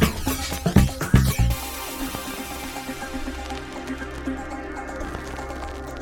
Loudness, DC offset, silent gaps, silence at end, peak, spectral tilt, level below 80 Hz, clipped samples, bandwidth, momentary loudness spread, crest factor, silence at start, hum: -26 LUFS; under 0.1%; none; 0 s; -2 dBFS; -5 dB/octave; -30 dBFS; under 0.1%; 19.5 kHz; 13 LU; 24 dB; 0 s; none